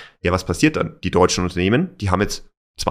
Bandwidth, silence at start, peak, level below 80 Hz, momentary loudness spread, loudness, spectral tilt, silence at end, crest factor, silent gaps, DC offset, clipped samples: 15.5 kHz; 0 s; -2 dBFS; -38 dBFS; 7 LU; -19 LUFS; -5 dB/octave; 0 s; 18 dB; 2.57-2.74 s; under 0.1%; under 0.1%